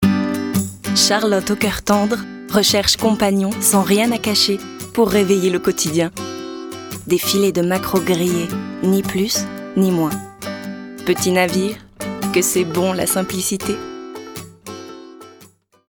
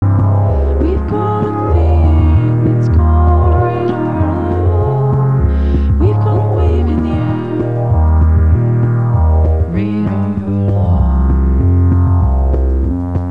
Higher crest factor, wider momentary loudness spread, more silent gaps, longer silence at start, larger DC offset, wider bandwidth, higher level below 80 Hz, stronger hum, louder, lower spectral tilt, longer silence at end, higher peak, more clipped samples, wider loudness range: first, 18 dB vs 10 dB; first, 15 LU vs 5 LU; neither; about the same, 0 s vs 0 s; second, under 0.1% vs 2%; first, over 20 kHz vs 4 kHz; second, -48 dBFS vs -16 dBFS; neither; second, -17 LUFS vs -13 LUFS; second, -4 dB/octave vs -11 dB/octave; first, 0.45 s vs 0 s; about the same, -2 dBFS vs 0 dBFS; neither; first, 5 LU vs 1 LU